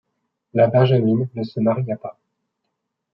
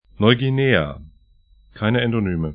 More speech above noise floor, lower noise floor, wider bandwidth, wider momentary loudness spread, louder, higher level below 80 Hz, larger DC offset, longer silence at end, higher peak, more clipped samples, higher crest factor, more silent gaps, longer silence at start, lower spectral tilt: first, 59 dB vs 35 dB; first, -77 dBFS vs -54 dBFS; first, 5.6 kHz vs 5 kHz; about the same, 12 LU vs 10 LU; about the same, -19 LUFS vs -19 LUFS; second, -66 dBFS vs -42 dBFS; neither; first, 1 s vs 0 s; second, -4 dBFS vs 0 dBFS; neither; about the same, 18 dB vs 20 dB; neither; first, 0.55 s vs 0.2 s; about the same, -11 dB/octave vs -11.5 dB/octave